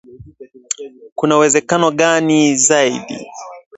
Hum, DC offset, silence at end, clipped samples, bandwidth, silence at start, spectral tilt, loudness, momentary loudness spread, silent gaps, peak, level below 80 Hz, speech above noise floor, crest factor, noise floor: none; under 0.1%; 0.2 s; under 0.1%; 8.2 kHz; 0.15 s; -3 dB/octave; -14 LUFS; 18 LU; 1.12-1.16 s; 0 dBFS; -56 dBFS; 25 dB; 16 dB; -39 dBFS